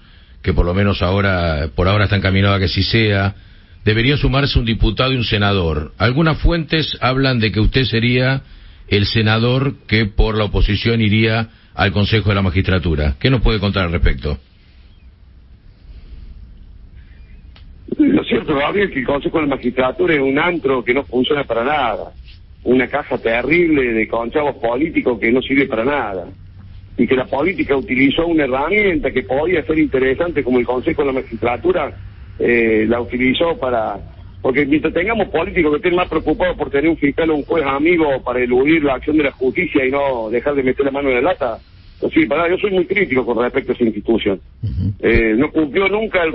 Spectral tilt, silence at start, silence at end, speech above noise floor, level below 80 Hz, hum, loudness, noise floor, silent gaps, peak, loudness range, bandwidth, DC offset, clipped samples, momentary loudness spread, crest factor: -10.5 dB/octave; 0.45 s; 0 s; 28 dB; -28 dBFS; none; -16 LUFS; -44 dBFS; none; -2 dBFS; 2 LU; 5.8 kHz; under 0.1%; under 0.1%; 6 LU; 16 dB